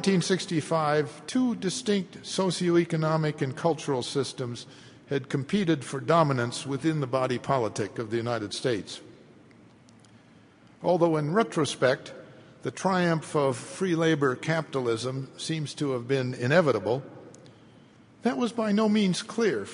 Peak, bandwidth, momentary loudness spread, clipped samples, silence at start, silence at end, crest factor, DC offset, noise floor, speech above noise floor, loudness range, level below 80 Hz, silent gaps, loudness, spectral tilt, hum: -8 dBFS; 11 kHz; 9 LU; under 0.1%; 0 s; 0 s; 20 dB; under 0.1%; -55 dBFS; 29 dB; 3 LU; -68 dBFS; none; -27 LUFS; -5.5 dB/octave; none